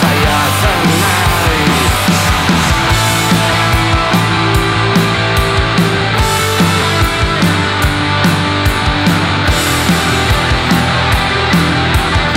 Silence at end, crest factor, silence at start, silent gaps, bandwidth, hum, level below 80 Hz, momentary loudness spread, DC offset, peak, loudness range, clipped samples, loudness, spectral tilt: 0 s; 8 dB; 0 s; none; 16.5 kHz; none; -22 dBFS; 1 LU; under 0.1%; -2 dBFS; 1 LU; under 0.1%; -11 LUFS; -4.5 dB/octave